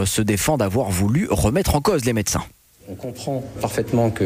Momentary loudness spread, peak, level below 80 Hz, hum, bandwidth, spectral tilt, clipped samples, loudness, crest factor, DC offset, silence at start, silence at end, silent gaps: 12 LU; -6 dBFS; -36 dBFS; none; 16 kHz; -5 dB/octave; under 0.1%; -21 LUFS; 14 dB; under 0.1%; 0 s; 0 s; none